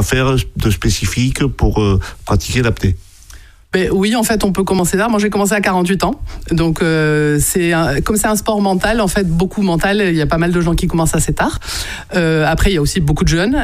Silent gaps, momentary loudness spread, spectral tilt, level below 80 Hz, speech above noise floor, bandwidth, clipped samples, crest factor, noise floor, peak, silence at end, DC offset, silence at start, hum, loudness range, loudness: none; 5 LU; -5 dB/octave; -24 dBFS; 24 dB; 15.5 kHz; under 0.1%; 12 dB; -38 dBFS; -2 dBFS; 0 s; under 0.1%; 0 s; none; 2 LU; -15 LUFS